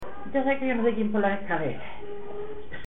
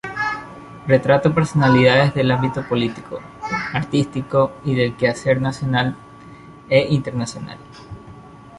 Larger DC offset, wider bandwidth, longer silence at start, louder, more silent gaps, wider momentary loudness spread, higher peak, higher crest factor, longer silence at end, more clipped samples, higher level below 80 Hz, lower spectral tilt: first, 3% vs under 0.1%; second, 4 kHz vs 11.5 kHz; about the same, 0 s vs 0.05 s; second, -27 LUFS vs -18 LUFS; neither; second, 14 LU vs 20 LU; second, -10 dBFS vs -2 dBFS; about the same, 16 dB vs 18 dB; about the same, 0 s vs 0 s; neither; about the same, -52 dBFS vs -48 dBFS; first, -8.5 dB/octave vs -6.5 dB/octave